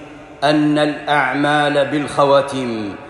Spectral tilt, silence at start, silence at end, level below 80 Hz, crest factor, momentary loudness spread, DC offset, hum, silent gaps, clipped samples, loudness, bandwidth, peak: -5.5 dB/octave; 0 s; 0 s; -54 dBFS; 16 dB; 7 LU; under 0.1%; none; none; under 0.1%; -16 LUFS; 11.5 kHz; -2 dBFS